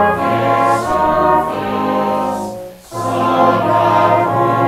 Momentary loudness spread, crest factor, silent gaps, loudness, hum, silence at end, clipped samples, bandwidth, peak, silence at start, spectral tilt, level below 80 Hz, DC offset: 10 LU; 14 dB; none; -14 LUFS; none; 0 s; under 0.1%; 16 kHz; 0 dBFS; 0 s; -6.5 dB/octave; -44 dBFS; under 0.1%